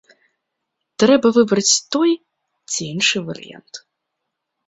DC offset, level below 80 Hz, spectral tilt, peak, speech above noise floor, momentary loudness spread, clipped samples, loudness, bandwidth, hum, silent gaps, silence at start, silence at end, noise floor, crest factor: under 0.1%; -62 dBFS; -3 dB/octave; -2 dBFS; 61 dB; 23 LU; under 0.1%; -17 LUFS; 8.2 kHz; none; none; 1 s; 0.9 s; -78 dBFS; 18 dB